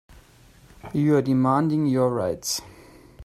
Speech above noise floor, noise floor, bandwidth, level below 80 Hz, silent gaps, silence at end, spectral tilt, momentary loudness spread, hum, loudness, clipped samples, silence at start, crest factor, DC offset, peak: 31 dB; -53 dBFS; 15 kHz; -54 dBFS; none; 0 s; -6 dB/octave; 8 LU; none; -23 LUFS; under 0.1%; 0.85 s; 16 dB; under 0.1%; -8 dBFS